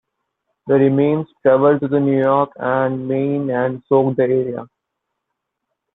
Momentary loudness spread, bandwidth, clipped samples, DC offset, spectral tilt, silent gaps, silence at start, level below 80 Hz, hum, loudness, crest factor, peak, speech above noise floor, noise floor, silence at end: 6 LU; 4 kHz; under 0.1%; under 0.1%; -11.5 dB/octave; none; 0.65 s; -62 dBFS; none; -17 LUFS; 16 dB; -2 dBFS; 61 dB; -78 dBFS; 1.3 s